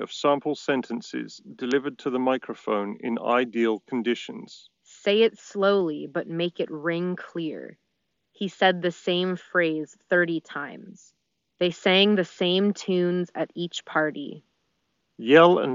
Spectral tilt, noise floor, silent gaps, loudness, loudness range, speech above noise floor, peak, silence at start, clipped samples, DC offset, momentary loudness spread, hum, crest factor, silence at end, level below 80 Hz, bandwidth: -3 dB/octave; -77 dBFS; none; -25 LUFS; 3 LU; 53 dB; -4 dBFS; 0 s; under 0.1%; under 0.1%; 14 LU; none; 22 dB; 0 s; -78 dBFS; 7.4 kHz